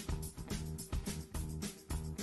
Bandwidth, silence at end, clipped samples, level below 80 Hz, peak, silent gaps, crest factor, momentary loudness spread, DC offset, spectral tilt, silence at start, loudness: 12.5 kHz; 0 s; under 0.1%; -46 dBFS; -26 dBFS; none; 14 dB; 2 LU; under 0.1%; -5 dB/octave; 0 s; -43 LUFS